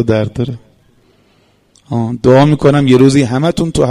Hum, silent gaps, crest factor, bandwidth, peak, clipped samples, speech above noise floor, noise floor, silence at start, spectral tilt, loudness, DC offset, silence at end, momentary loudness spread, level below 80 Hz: none; none; 12 dB; 11.5 kHz; 0 dBFS; 0.1%; 42 dB; -52 dBFS; 0 s; -7 dB/octave; -11 LUFS; under 0.1%; 0 s; 13 LU; -38 dBFS